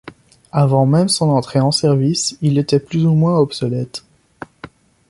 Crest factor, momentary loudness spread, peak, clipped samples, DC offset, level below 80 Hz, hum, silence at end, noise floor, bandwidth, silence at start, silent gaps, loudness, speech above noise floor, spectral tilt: 14 dB; 11 LU; -2 dBFS; under 0.1%; under 0.1%; -52 dBFS; none; 0.45 s; -40 dBFS; 11.5 kHz; 0.55 s; none; -16 LUFS; 25 dB; -6 dB/octave